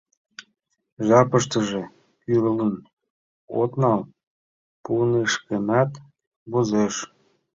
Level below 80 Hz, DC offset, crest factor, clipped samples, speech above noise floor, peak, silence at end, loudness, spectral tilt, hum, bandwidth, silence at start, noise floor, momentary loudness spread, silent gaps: -60 dBFS; under 0.1%; 20 dB; under 0.1%; over 69 dB; -4 dBFS; 0.5 s; -22 LUFS; -5.5 dB/octave; none; 7.8 kHz; 0.4 s; under -90 dBFS; 17 LU; 0.92-0.97 s, 2.93-2.97 s, 3.10-3.48 s, 4.23-4.84 s, 6.27-6.46 s